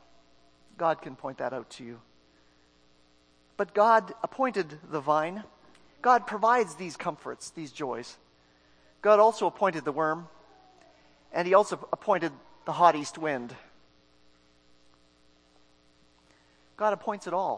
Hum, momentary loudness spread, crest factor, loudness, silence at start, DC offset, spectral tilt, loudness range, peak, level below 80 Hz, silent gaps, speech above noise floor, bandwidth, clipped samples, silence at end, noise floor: 60 Hz at -70 dBFS; 17 LU; 24 dB; -28 LUFS; 0.8 s; under 0.1%; -5 dB/octave; 10 LU; -6 dBFS; -72 dBFS; none; 36 dB; 10.5 kHz; under 0.1%; 0 s; -64 dBFS